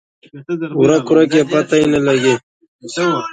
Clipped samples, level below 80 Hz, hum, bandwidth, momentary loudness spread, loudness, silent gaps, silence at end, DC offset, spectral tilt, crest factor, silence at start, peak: under 0.1%; -52 dBFS; none; 9.4 kHz; 10 LU; -14 LUFS; 2.43-2.60 s, 2.68-2.79 s; 0 s; under 0.1%; -5.5 dB/octave; 14 dB; 0.35 s; 0 dBFS